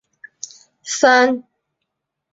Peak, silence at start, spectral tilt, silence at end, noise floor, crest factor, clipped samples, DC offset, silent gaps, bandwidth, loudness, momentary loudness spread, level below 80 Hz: -2 dBFS; 0.85 s; -1 dB/octave; 0.95 s; -78 dBFS; 18 dB; under 0.1%; under 0.1%; none; 7.8 kHz; -15 LUFS; 22 LU; -70 dBFS